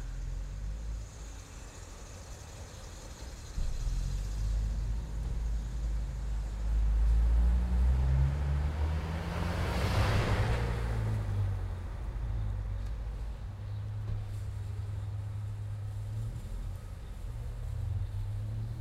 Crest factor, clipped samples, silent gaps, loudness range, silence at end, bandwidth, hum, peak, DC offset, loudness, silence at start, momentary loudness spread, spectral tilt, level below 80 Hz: 16 dB; under 0.1%; none; 9 LU; 0 s; 12.5 kHz; none; -18 dBFS; under 0.1%; -35 LUFS; 0 s; 16 LU; -6.5 dB/octave; -34 dBFS